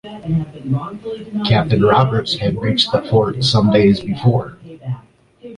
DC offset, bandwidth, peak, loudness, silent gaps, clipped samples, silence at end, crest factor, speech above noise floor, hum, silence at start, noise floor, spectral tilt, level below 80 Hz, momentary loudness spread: under 0.1%; 11 kHz; -2 dBFS; -16 LUFS; none; under 0.1%; 0 s; 14 dB; 28 dB; none; 0.05 s; -44 dBFS; -6.5 dB/octave; -42 dBFS; 16 LU